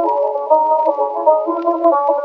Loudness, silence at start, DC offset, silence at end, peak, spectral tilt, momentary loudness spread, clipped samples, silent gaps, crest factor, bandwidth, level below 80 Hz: -15 LUFS; 0 s; under 0.1%; 0 s; 0 dBFS; -6.5 dB/octave; 4 LU; under 0.1%; none; 14 dB; 5 kHz; under -90 dBFS